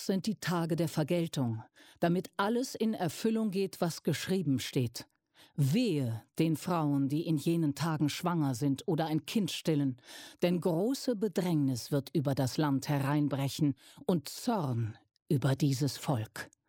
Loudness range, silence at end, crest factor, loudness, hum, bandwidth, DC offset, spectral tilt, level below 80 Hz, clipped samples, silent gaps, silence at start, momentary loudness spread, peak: 2 LU; 0.2 s; 16 dB; -32 LUFS; none; 17 kHz; under 0.1%; -6 dB/octave; -72 dBFS; under 0.1%; 15.22-15.26 s; 0 s; 5 LU; -16 dBFS